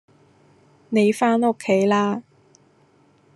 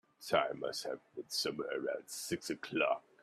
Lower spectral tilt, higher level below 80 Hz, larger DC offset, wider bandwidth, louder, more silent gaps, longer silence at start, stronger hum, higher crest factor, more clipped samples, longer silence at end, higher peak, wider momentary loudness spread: first, -6 dB/octave vs -3 dB/octave; about the same, -74 dBFS vs -78 dBFS; neither; second, 12.5 kHz vs 15.5 kHz; first, -20 LUFS vs -37 LUFS; neither; first, 0.9 s vs 0.2 s; neither; about the same, 18 dB vs 22 dB; neither; first, 1.15 s vs 0.25 s; first, -6 dBFS vs -16 dBFS; about the same, 7 LU vs 7 LU